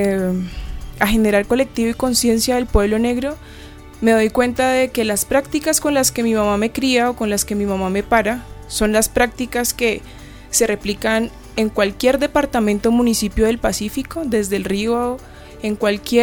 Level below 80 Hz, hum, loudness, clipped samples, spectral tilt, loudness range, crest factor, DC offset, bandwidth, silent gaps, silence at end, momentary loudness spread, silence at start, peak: -34 dBFS; none; -18 LUFS; under 0.1%; -4 dB/octave; 2 LU; 16 dB; under 0.1%; over 20 kHz; none; 0 s; 9 LU; 0 s; -2 dBFS